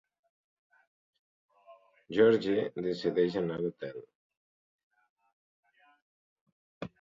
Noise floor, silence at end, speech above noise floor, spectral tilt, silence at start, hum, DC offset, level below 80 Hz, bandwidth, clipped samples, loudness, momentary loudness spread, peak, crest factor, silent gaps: -59 dBFS; 0.15 s; 30 dB; -7.5 dB/octave; 1.7 s; none; under 0.1%; -72 dBFS; 7.4 kHz; under 0.1%; -30 LUFS; 20 LU; -14 dBFS; 22 dB; 4.15-4.30 s, 4.37-4.90 s, 5.09-5.16 s, 5.33-5.63 s, 6.02-6.46 s, 6.52-6.81 s